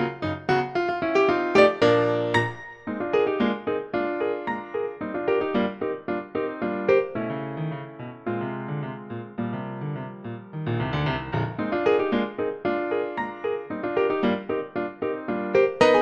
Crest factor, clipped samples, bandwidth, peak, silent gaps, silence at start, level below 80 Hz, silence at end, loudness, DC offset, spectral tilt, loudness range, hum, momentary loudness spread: 20 dB; under 0.1%; 8.8 kHz; -4 dBFS; none; 0 s; -56 dBFS; 0 s; -25 LUFS; under 0.1%; -7 dB/octave; 8 LU; none; 12 LU